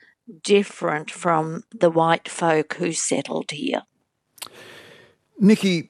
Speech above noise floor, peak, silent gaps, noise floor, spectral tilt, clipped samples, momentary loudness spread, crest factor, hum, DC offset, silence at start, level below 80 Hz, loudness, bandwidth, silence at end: 38 dB; -2 dBFS; none; -59 dBFS; -4.5 dB/octave; under 0.1%; 17 LU; 20 dB; none; under 0.1%; 0.3 s; -74 dBFS; -22 LUFS; 13.5 kHz; 0.05 s